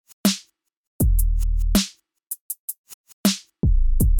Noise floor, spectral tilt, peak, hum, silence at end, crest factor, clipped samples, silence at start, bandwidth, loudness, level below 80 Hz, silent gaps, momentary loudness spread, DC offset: -53 dBFS; -4.5 dB/octave; -6 dBFS; none; 0 s; 14 dB; under 0.1%; 0.25 s; 19 kHz; -24 LUFS; -22 dBFS; 0.77-0.99 s, 2.41-2.50 s, 2.59-2.68 s, 2.78-2.84 s, 2.94-3.04 s, 3.13-3.24 s; 12 LU; under 0.1%